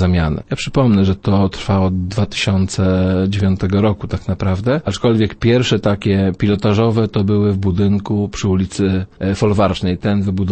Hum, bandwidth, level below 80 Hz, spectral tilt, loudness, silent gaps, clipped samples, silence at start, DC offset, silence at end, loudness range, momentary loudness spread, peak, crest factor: none; 8.8 kHz; -36 dBFS; -7 dB/octave; -16 LUFS; none; under 0.1%; 0 s; under 0.1%; 0 s; 1 LU; 5 LU; -2 dBFS; 14 dB